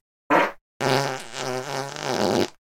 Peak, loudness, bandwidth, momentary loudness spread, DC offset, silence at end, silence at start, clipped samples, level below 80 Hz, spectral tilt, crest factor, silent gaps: -4 dBFS; -25 LUFS; 17 kHz; 8 LU; under 0.1%; 0.15 s; 0.3 s; under 0.1%; -64 dBFS; -4 dB/octave; 20 dB; 0.61-0.80 s